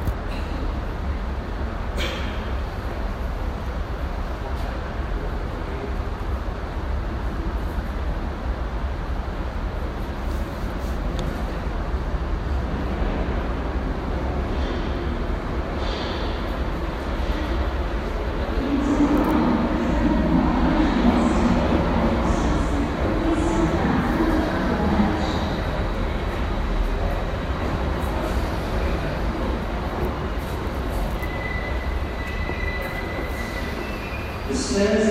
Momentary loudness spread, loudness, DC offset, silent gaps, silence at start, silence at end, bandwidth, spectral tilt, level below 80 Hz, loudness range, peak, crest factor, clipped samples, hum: 9 LU; -25 LUFS; under 0.1%; none; 0 s; 0 s; 15 kHz; -6.5 dB/octave; -28 dBFS; 8 LU; -6 dBFS; 18 dB; under 0.1%; none